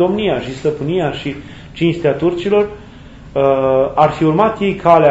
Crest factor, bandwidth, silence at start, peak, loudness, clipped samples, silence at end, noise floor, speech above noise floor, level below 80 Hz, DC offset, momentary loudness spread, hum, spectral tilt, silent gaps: 14 dB; 8 kHz; 0 s; 0 dBFS; -15 LUFS; under 0.1%; 0 s; -36 dBFS; 22 dB; -42 dBFS; under 0.1%; 11 LU; none; -7.5 dB/octave; none